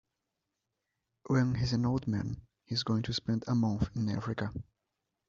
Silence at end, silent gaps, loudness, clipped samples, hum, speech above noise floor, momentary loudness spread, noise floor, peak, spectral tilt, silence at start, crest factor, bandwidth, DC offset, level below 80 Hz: 0.65 s; none; -33 LUFS; under 0.1%; none; 54 dB; 8 LU; -86 dBFS; -16 dBFS; -6 dB/octave; 1.25 s; 16 dB; 7.6 kHz; under 0.1%; -54 dBFS